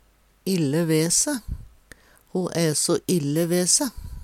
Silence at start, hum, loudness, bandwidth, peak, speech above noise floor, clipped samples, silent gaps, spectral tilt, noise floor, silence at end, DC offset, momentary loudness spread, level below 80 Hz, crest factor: 0.45 s; none; -22 LUFS; 16.5 kHz; -6 dBFS; 29 dB; under 0.1%; none; -4 dB/octave; -52 dBFS; 0 s; under 0.1%; 13 LU; -44 dBFS; 18 dB